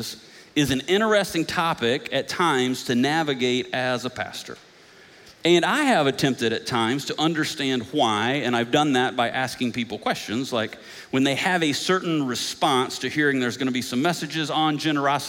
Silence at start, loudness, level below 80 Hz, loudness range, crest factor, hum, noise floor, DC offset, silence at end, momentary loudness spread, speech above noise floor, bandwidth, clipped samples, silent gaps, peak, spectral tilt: 0 s; -23 LUFS; -60 dBFS; 2 LU; 16 dB; none; -50 dBFS; under 0.1%; 0 s; 7 LU; 27 dB; 17 kHz; under 0.1%; none; -6 dBFS; -4 dB/octave